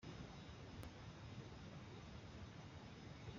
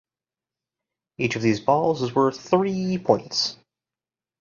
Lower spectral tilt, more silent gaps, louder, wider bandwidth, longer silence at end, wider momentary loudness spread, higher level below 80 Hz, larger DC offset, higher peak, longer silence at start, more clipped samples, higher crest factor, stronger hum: about the same, -5 dB/octave vs -5.5 dB/octave; neither; second, -56 LUFS vs -23 LUFS; about the same, 7.4 kHz vs 7.4 kHz; second, 0 s vs 0.85 s; second, 1 LU vs 5 LU; about the same, -66 dBFS vs -62 dBFS; neither; second, -40 dBFS vs -4 dBFS; second, 0 s vs 1.2 s; neither; second, 16 dB vs 22 dB; neither